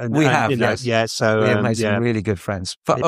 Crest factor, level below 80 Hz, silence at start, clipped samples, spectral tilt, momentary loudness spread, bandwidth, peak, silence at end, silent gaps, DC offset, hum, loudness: 18 dB; -52 dBFS; 0 s; under 0.1%; -5.5 dB/octave; 7 LU; 15 kHz; -2 dBFS; 0 s; 2.77-2.81 s; under 0.1%; none; -19 LUFS